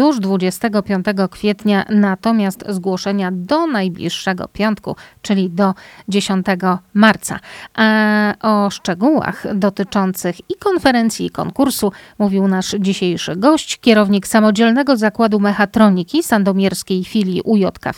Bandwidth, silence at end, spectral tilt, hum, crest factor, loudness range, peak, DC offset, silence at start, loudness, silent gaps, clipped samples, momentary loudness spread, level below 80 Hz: 16.5 kHz; 0.05 s; -5.5 dB/octave; none; 16 dB; 5 LU; 0 dBFS; under 0.1%; 0 s; -16 LUFS; none; under 0.1%; 8 LU; -50 dBFS